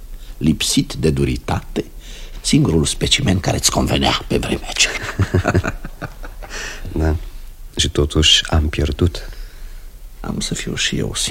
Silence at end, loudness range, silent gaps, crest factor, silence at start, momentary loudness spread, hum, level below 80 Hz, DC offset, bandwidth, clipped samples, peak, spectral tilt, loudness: 0 s; 4 LU; none; 18 dB; 0 s; 18 LU; none; -28 dBFS; under 0.1%; 16.5 kHz; under 0.1%; 0 dBFS; -4 dB/octave; -18 LUFS